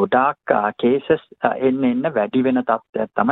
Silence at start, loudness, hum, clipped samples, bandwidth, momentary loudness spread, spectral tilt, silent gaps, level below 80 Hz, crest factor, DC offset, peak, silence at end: 0 s; -19 LUFS; none; under 0.1%; 4.1 kHz; 4 LU; -9.5 dB/octave; 2.89-2.93 s; -60 dBFS; 18 dB; under 0.1%; -2 dBFS; 0 s